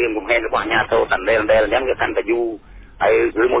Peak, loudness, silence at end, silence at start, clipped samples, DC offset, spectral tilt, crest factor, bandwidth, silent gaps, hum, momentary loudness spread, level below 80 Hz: -6 dBFS; -18 LUFS; 0 s; 0 s; under 0.1%; under 0.1%; -8.5 dB/octave; 12 dB; 4 kHz; none; none; 5 LU; -42 dBFS